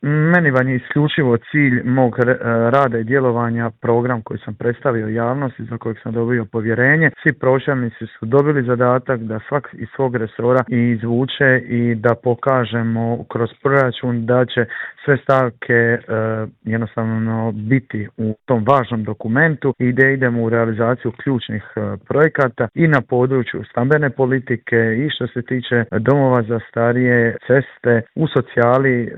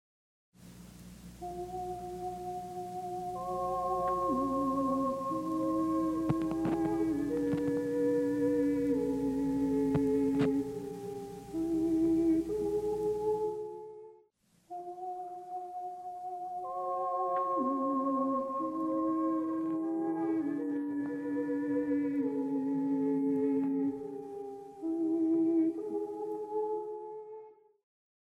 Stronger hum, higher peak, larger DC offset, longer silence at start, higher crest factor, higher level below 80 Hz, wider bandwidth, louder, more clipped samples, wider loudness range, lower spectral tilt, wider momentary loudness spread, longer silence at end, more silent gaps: neither; first, 0 dBFS vs -16 dBFS; neither; second, 0 s vs 0.6 s; about the same, 16 dB vs 16 dB; about the same, -56 dBFS vs -60 dBFS; second, 4.1 kHz vs 15 kHz; first, -17 LUFS vs -33 LUFS; neither; second, 2 LU vs 7 LU; first, -9.5 dB/octave vs -8 dB/octave; second, 9 LU vs 13 LU; second, 0 s vs 0.8 s; neither